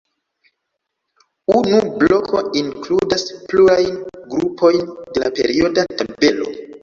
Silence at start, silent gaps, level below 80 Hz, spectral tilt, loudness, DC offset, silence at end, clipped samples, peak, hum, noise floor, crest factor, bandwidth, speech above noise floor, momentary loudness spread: 1.5 s; none; -50 dBFS; -5 dB/octave; -17 LUFS; under 0.1%; 0.05 s; under 0.1%; -2 dBFS; none; -76 dBFS; 16 dB; 7.4 kHz; 60 dB; 10 LU